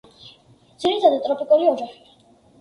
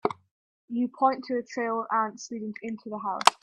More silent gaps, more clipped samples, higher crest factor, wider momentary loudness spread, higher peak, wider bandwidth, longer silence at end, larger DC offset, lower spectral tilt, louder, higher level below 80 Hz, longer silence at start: second, none vs 0.31-0.68 s; neither; second, 20 dB vs 28 dB; about the same, 10 LU vs 12 LU; about the same, -2 dBFS vs 0 dBFS; second, 11 kHz vs 15 kHz; first, 0.7 s vs 0.1 s; neither; first, -4.5 dB/octave vs -3 dB/octave; first, -19 LUFS vs -29 LUFS; first, -66 dBFS vs -76 dBFS; first, 0.25 s vs 0.05 s